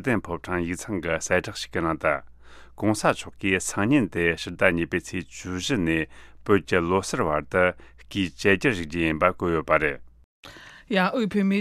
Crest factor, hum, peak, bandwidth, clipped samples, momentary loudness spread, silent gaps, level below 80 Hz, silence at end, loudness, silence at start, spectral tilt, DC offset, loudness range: 22 dB; none; -2 dBFS; 14.5 kHz; under 0.1%; 9 LU; 10.24-10.43 s; -48 dBFS; 0 s; -25 LUFS; 0 s; -5 dB/octave; under 0.1%; 2 LU